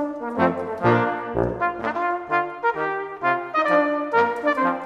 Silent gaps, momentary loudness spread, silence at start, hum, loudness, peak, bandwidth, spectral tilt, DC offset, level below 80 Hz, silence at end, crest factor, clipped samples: none; 5 LU; 0 s; none; -22 LUFS; -4 dBFS; 10 kHz; -7.5 dB/octave; under 0.1%; -50 dBFS; 0 s; 18 dB; under 0.1%